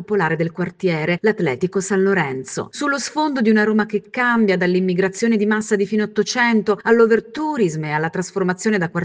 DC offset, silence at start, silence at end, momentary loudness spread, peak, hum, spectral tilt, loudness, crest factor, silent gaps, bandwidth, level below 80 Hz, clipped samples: under 0.1%; 0 s; 0 s; 6 LU; -2 dBFS; none; -5.5 dB/octave; -19 LUFS; 16 dB; none; 9.8 kHz; -62 dBFS; under 0.1%